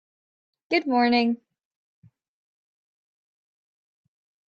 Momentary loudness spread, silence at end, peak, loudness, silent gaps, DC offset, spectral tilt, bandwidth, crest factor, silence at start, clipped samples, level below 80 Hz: 7 LU; 3.1 s; -8 dBFS; -23 LUFS; none; under 0.1%; -5.5 dB/octave; 6.8 kHz; 20 dB; 0.7 s; under 0.1%; -74 dBFS